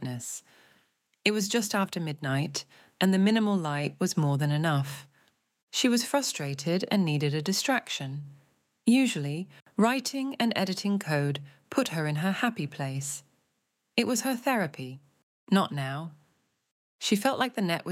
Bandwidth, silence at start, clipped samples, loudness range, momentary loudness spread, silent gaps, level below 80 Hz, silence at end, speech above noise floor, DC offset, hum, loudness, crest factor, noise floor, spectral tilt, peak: 16.5 kHz; 0 s; under 0.1%; 3 LU; 12 LU; 5.63-5.67 s, 9.62-9.66 s, 15.23-15.47 s, 16.72-16.99 s; -78 dBFS; 0 s; 50 dB; under 0.1%; none; -28 LUFS; 20 dB; -78 dBFS; -4.5 dB/octave; -8 dBFS